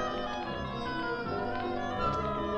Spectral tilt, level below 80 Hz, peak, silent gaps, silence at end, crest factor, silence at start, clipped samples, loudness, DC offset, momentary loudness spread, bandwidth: -6 dB/octave; -48 dBFS; -18 dBFS; none; 0 s; 16 dB; 0 s; under 0.1%; -34 LUFS; under 0.1%; 4 LU; 8.8 kHz